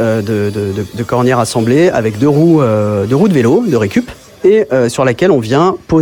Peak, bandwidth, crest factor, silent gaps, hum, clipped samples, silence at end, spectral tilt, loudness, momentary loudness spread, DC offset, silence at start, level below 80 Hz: 0 dBFS; 18 kHz; 10 dB; none; none; under 0.1%; 0 s; -7 dB/octave; -12 LUFS; 7 LU; under 0.1%; 0 s; -44 dBFS